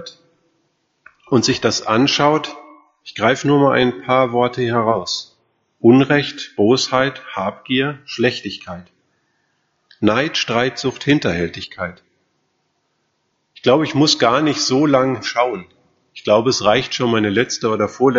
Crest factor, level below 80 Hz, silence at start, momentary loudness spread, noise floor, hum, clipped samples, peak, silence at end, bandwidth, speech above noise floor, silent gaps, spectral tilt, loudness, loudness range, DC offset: 18 dB; -54 dBFS; 0 s; 12 LU; -68 dBFS; none; under 0.1%; 0 dBFS; 0 s; 7.8 kHz; 52 dB; none; -3.5 dB/octave; -17 LUFS; 5 LU; under 0.1%